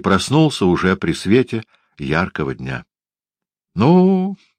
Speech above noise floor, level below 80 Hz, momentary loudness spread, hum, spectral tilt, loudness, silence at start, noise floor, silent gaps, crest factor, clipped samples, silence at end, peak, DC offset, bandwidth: over 74 dB; -46 dBFS; 15 LU; none; -6.5 dB/octave; -17 LUFS; 0.05 s; under -90 dBFS; none; 16 dB; under 0.1%; 0.25 s; 0 dBFS; under 0.1%; 10.5 kHz